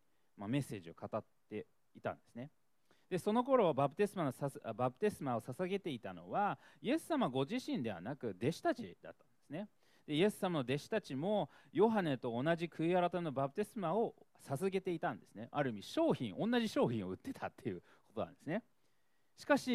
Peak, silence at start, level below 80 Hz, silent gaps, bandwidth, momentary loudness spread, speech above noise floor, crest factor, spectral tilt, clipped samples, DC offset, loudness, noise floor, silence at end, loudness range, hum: -16 dBFS; 0.35 s; -78 dBFS; none; 15 kHz; 14 LU; 44 dB; 22 dB; -6.5 dB/octave; under 0.1%; under 0.1%; -38 LUFS; -81 dBFS; 0 s; 4 LU; none